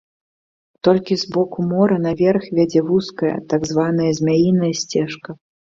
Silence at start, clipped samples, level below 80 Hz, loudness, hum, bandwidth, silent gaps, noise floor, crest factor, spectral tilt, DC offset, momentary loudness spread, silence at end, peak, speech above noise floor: 0.85 s; under 0.1%; -54 dBFS; -18 LUFS; none; 7.8 kHz; none; under -90 dBFS; 16 dB; -6.5 dB/octave; under 0.1%; 6 LU; 0.45 s; -2 dBFS; over 73 dB